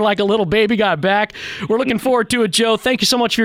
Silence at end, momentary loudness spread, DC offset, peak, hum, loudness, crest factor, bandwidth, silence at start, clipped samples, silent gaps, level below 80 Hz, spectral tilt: 0 s; 4 LU; under 0.1%; -2 dBFS; none; -16 LUFS; 14 dB; 16.5 kHz; 0 s; under 0.1%; none; -48 dBFS; -3.5 dB/octave